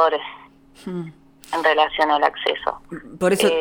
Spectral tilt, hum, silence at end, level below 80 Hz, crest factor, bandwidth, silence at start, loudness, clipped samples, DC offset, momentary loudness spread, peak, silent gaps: -4 dB/octave; none; 0 s; -54 dBFS; 18 dB; over 20 kHz; 0 s; -20 LUFS; under 0.1%; under 0.1%; 19 LU; -2 dBFS; none